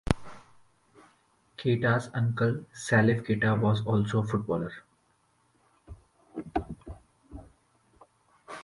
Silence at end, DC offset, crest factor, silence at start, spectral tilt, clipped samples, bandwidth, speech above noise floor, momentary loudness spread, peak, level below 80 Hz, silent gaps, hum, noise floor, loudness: 0 s; under 0.1%; 26 dB; 0.05 s; -7 dB/octave; under 0.1%; 11.5 kHz; 43 dB; 25 LU; -6 dBFS; -50 dBFS; none; none; -69 dBFS; -28 LUFS